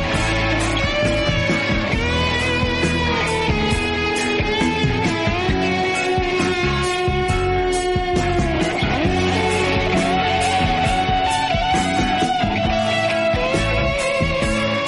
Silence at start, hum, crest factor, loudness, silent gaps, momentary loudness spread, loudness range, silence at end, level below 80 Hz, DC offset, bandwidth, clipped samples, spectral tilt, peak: 0 s; none; 12 dB; -19 LUFS; none; 1 LU; 1 LU; 0 s; -30 dBFS; under 0.1%; 11.5 kHz; under 0.1%; -5 dB/octave; -6 dBFS